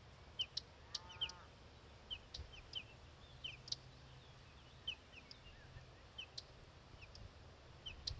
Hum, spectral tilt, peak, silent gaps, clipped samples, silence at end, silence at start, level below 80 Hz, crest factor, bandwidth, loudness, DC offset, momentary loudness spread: none; -2.5 dB/octave; -28 dBFS; none; under 0.1%; 0 s; 0 s; -64 dBFS; 26 dB; 8 kHz; -50 LUFS; under 0.1%; 16 LU